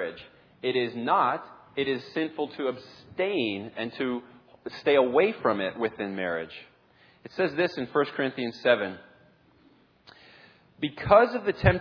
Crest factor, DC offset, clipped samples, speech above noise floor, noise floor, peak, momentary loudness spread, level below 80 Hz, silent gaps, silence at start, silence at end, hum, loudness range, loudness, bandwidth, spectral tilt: 24 dB; under 0.1%; under 0.1%; 34 dB; -61 dBFS; -4 dBFS; 15 LU; -50 dBFS; none; 0 s; 0 s; none; 4 LU; -27 LUFS; 5.4 kHz; -7.5 dB/octave